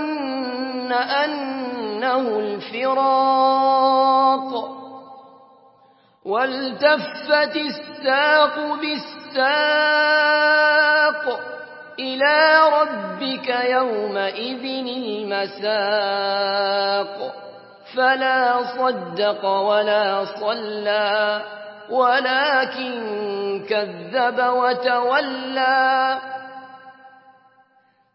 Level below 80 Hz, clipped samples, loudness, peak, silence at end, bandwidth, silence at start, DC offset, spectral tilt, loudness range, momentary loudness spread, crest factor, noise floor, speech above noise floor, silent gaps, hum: -84 dBFS; under 0.1%; -19 LUFS; -2 dBFS; 1.05 s; 5.8 kHz; 0 s; under 0.1%; -7.5 dB/octave; 5 LU; 12 LU; 18 dB; -60 dBFS; 41 dB; none; none